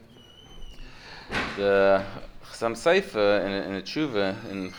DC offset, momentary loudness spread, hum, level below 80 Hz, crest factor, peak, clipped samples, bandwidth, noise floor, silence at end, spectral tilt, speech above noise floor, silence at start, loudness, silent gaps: under 0.1%; 22 LU; none; -48 dBFS; 18 dB; -8 dBFS; under 0.1%; 19 kHz; -50 dBFS; 0 s; -5 dB/octave; 26 dB; 0.2 s; -25 LUFS; none